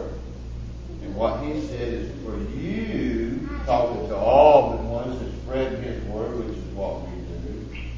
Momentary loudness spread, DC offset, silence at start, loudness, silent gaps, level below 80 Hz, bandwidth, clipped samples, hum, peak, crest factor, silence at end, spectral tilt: 17 LU; under 0.1%; 0 s; -24 LUFS; none; -34 dBFS; 7.4 kHz; under 0.1%; none; -2 dBFS; 22 dB; 0 s; -7.5 dB/octave